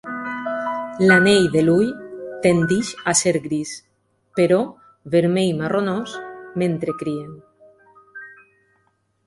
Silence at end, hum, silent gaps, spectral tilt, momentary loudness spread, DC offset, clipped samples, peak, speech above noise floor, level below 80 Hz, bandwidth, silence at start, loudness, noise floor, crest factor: 0.95 s; none; none; -4.5 dB/octave; 18 LU; under 0.1%; under 0.1%; -2 dBFS; 47 dB; -58 dBFS; 11.5 kHz; 0.05 s; -19 LUFS; -66 dBFS; 20 dB